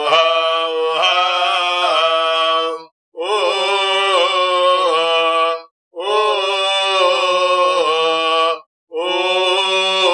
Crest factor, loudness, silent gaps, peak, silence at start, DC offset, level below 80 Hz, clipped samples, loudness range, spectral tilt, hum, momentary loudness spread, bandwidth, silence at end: 16 dB; -15 LUFS; 2.91-3.12 s, 5.71-5.91 s, 8.66-8.87 s; 0 dBFS; 0 s; under 0.1%; under -90 dBFS; under 0.1%; 0 LU; -0.5 dB/octave; none; 6 LU; 11.5 kHz; 0 s